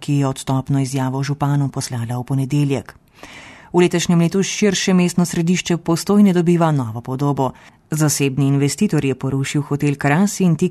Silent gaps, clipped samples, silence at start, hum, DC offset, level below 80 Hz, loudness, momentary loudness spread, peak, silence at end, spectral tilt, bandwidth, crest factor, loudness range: none; under 0.1%; 0 s; none; under 0.1%; -52 dBFS; -18 LUFS; 7 LU; -2 dBFS; 0 s; -5.5 dB/octave; 13 kHz; 16 dB; 4 LU